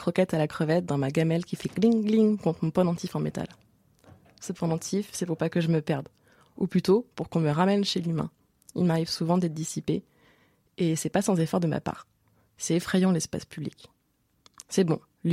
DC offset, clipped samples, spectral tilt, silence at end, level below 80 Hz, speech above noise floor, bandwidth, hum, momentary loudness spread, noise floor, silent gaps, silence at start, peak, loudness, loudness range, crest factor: under 0.1%; under 0.1%; -6 dB/octave; 0 s; -62 dBFS; 45 dB; 15 kHz; none; 12 LU; -71 dBFS; none; 0 s; -10 dBFS; -27 LUFS; 4 LU; 18 dB